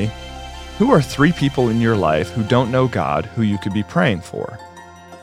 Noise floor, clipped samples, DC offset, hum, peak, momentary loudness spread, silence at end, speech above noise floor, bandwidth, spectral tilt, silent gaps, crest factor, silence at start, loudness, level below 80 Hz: -39 dBFS; under 0.1%; under 0.1%; none; -2 dBFS; 17 LU; 0 s; 22 dB; 15 kHz; -7 dB/octave; none; 18 dB; 0 s; -18 LUFS; -40 dBFS